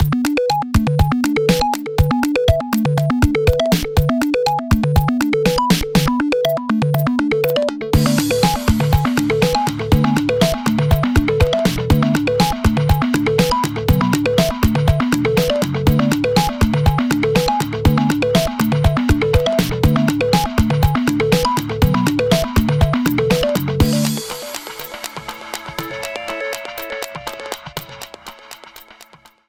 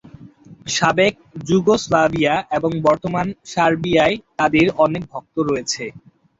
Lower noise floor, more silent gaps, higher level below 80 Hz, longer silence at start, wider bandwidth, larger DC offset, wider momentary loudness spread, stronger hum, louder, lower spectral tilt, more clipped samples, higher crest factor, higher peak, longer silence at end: about the same, -46 dBFS vs -43 dBFS; neither; first, -26 dBFS vs -50 dBFS; second, 0 s vs 0.2 s; first, 20 kHz vs 8 kHz; neither; about the same, 11 LU vs 9 LU; neither; about the same, -17 LUFS vs -18 LUFS; about the same, -6 dB/octave vs -5 dB/octave; neither; about the same, 16 dB vs 18 dB; about the same, 0 dBFS vs -2 dBFS; about the same, 0.45 s vs 0.4 s